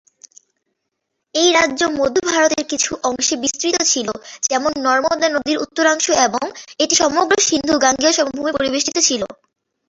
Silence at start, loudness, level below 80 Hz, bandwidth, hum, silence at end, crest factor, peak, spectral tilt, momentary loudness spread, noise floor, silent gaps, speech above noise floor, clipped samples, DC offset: 1.35 s; -16 LUFS; -54 dBFS; 8.2 kHz; none; 0.55 s; 18 dB; 0 dBFS; -1 dB/octave; 7 LU; -76 dBFS; none; 59 dB; under 0.1%; under 0.1%